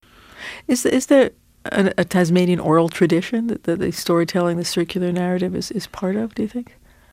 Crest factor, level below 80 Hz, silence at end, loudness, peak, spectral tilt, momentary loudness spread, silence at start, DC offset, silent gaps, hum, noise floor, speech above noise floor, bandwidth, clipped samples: 18 dB; -52 dBFS; 0.5 s; -19 LUFS; -2 dBFS; -5.5 dB/octave; 11 LU; 0.35 s; under 0.1%; none; none; -38 dBFS; 19 dB; 16.5 kHz; under 0.1%